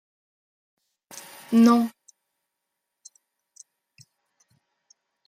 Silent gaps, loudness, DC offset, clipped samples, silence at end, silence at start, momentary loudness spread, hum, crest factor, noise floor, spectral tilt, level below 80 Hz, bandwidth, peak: none; -20 LUFS; under 0.1%; under 0.1%; 3.4 s; 1.5 s; 25 LU; none; 22 dB; -82 dBFS; -5.5 dB/octave; -78 dBFS; 15.5 kHz; -8 dBFS